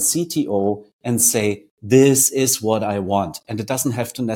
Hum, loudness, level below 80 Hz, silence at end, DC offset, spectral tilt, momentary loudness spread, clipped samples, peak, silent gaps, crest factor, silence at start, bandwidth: none; -18 LUFS; -58 dBFS; 0 s; under 0.1%; -4 dB/octave; 11 LU; under 0.1%; 0 dBFS; 0.93-0.99 s, 1.71-1.77 s; 18 dB; 0 s; 17 kHz